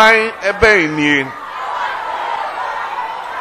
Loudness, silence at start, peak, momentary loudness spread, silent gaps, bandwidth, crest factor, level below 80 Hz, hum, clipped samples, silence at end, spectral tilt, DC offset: -15 LUFS; 0 s; 0 dBFS; 13 LU; none; 16 kHz; 16 dB; -40 dBFS; none; under 0.1%; 0 s; -4 dB/octave; under 0.1%